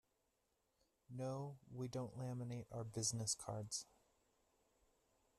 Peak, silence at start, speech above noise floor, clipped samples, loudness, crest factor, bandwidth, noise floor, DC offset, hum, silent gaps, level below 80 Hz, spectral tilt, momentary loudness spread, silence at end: -28 dBFS; 1.1 s; 38 dB; under 0.1%; -46 LUFS; 22 dB; 13.5 kHz; -85 dBFS; under 0.1%; none; none; -78 dBFS; -4.5 dB/octave; 9 LU; 1.55 s